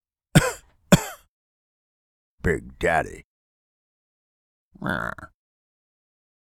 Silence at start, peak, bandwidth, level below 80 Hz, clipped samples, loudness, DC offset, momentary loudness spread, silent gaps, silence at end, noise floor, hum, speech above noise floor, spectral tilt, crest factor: 0.35 s; 0 dBFS; 18 kHz; -42 dBFS; under 0.1%; -24 LUFS; under 0.1%; 16 LU; 1.28-2.38 s, 3.24-4.71 s; 1.15 s; under -90 dBFS; none; over 64 dB; -5 dB/octave; 26 dB